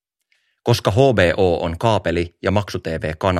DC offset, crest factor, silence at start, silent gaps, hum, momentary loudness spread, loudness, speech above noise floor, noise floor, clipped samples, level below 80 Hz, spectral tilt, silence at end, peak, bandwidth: under 0.1%; 18 dB; 0.65 s; none; none; 10 LU; -19 LUFS; 49 dB; -66 dBFS; under 0.1%; -40 dBFS; -6 dB/octave; 0 s; 0 dBFS; 15 kHz